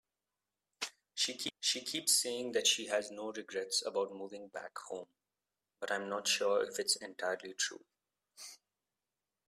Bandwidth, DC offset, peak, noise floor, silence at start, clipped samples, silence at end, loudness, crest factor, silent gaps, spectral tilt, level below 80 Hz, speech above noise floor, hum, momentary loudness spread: 15.5 kHz; under 0.1%; -14 dBFS; under -90 dBFS; 0.8 s; under 0.1%; 0.95 s; -35 LUFS; 24 dB; none; 0 dB/octave; -86 dBFS; over 53 dB; 50 Hz at -75 dBFS; 16 LU